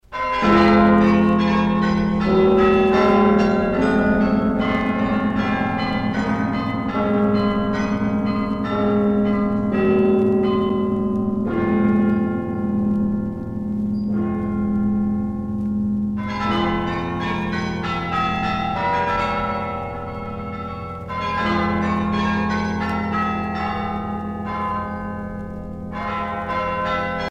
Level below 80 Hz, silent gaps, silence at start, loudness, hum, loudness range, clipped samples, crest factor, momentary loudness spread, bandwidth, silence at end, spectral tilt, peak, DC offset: -40 dBFS; none; 0.1 s; -20 LUFS; none; 7 LU; under 0.1%; 16 dB; 11 LU; 7.4 kHz; 0 s; -8 dB/octave; -4 dBFS; under 0.1%